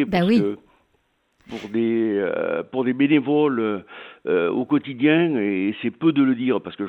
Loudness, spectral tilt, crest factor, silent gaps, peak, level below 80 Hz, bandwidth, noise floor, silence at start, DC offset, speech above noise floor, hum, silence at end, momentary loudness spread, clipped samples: -21 LUFS; -8 dB/octave; 16 dB; none; -4 dBFS; -60 dBFS; 6 kHz; -67 dBFS; 0 s; under 0.1%; 46 dB; none; 0 s; 11 LU; under 0.1%